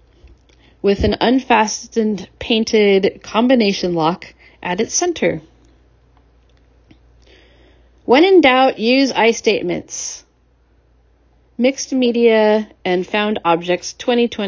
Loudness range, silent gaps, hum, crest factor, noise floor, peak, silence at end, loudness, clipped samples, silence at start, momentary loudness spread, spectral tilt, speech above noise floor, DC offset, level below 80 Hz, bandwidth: 8 LU; none; none; 16 dB; -56 dBFS; 0 dBFS; 0 s; -16 LUFS; under 0.1%; 0.85 s; 12 LU; -4 dB/octave; 40 dB; under 0.1%; -42 dBFS; 7.6 kHz